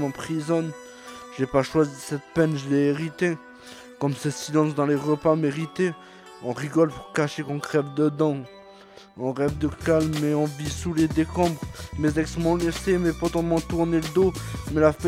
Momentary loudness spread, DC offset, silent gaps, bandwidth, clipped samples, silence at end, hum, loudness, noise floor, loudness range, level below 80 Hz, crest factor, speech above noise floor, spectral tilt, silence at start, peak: 12 LU; under 0.1%; none; 15.5 kHz; under 0.1%; 0 s; none; -25 LUFS; -48 dBFS; 2 LU; -46 dBFS; 18 dB; 24 dB; -6.5 dB/octave; 0 s; -6 dBFS